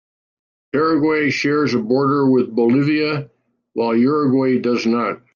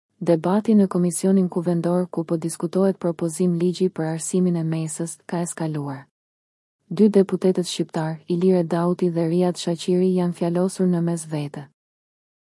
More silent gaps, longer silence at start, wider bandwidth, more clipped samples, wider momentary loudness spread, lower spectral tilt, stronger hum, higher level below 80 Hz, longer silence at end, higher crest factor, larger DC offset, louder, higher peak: second, none vs 6.11-6.79 s; first, 0.75 s vs 0.2 s; second, 7 kHz vs 12 kHz; neither; second, 6 LU vs 9 LU; about the same, -7 dB/octave vs -6.5 dB/octave; neither; first, -64 dBFS vs -72 dBFS; second, 0.2 s vs 0.75 s; about the same, 12 dB vs 16 dB; neither; first, -17 LUFS vs -22 LUFS; about the same, -6 dBFS vs -6 dBFS